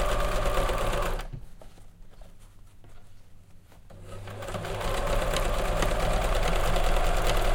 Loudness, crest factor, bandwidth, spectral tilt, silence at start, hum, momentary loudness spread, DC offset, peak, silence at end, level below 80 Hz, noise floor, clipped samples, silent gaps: -29 LUFS; 16 dB; 17 kHz; -4.5 dB/octave; 0 s; none; 15 LU; under 0.1%; -12 dBFS; 0 s; -30 dBFS; -49 dBFS; under 0.1%; none